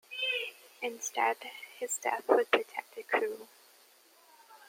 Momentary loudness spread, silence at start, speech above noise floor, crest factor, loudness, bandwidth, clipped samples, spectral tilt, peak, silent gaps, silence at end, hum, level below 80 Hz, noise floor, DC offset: 14 LU; 0.1 s; 29 dB; 26 dB; -32 LUFS; 16.5 kHz; under 0.1%; 0 dB/octave; -8 dBFS; none; 0.15 s; none; under -90 dBFS; -62 dBFS; under 0.1%